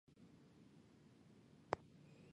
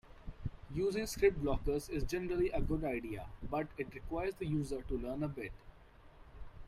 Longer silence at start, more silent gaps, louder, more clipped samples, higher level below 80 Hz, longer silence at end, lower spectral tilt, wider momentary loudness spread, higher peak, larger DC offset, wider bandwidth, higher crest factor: about the same, 0.1 s vs 0.05 s; neither; second, -50 LUFS vs -38 LUFS; neither; second, -80 dBFS vs -48 dBFS; about the same, 0 s vs 0 s; about the same, -6 dB/octave vs -6.5 dB/octave; first, 19 LU vs 15 LU; about the same, -20 dBFS vs -18 dBFS; neither; second, 10.5 kHz vs 15.5 kHz; first, 36 dB vs 20 dB